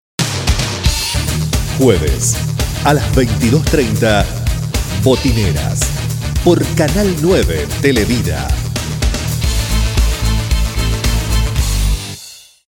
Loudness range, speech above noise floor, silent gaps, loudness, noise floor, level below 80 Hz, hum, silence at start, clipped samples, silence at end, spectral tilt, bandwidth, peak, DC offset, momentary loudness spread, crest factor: 3 LU; 24 dB; none; -15 LUFS; -36 dBFS; -20 dBFS; none; 0.2 s; under 0.1%; 0.35 s; -5 dB/octave; 19.5 kHz; 0 dBFS; under 0.1%; 6 LU; 14 dB